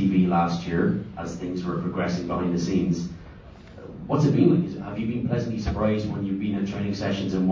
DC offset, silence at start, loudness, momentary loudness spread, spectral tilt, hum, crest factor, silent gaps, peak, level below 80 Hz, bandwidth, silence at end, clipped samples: under 0.1%; 0 s; -25 LUFS; 13 LU; -7.5 dB/octave; none; 20 dB; none; -6 dBFS; -44 dBFS; 7.4 kHz; 0 s; under 0.1%